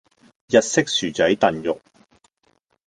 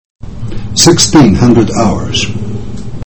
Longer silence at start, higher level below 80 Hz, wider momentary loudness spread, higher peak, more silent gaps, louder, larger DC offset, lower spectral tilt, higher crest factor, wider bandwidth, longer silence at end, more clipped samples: first, 0.5 s vs 0.2 s; second, -58 dBFS vs -26 dBFS; second, 10 LU vs 18 LU; about the same, -2 dBFS vs 0 dBFS; neither; second, -20 LUFS vs -8 LUFS; second, under 0.1% vs 9%; about the same, -3.5 dB/octave vs -4.5 dB/octave; first, 20 dB vs 10 dB; second, 10 kHz vs over 20 kHz; first, 1.1 s vs 0 s; second, under 0.1% vs 1%